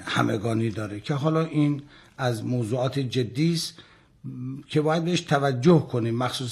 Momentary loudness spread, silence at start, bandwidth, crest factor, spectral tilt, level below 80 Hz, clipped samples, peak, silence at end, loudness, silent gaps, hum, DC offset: 12 LU; 0 s; 13 kHz; 16 dB; -6.5 dB/octave; -64 dBFS; under 0.1%; -8 dBFS; 0 s; -25 LUFS; none; none; under 0.1%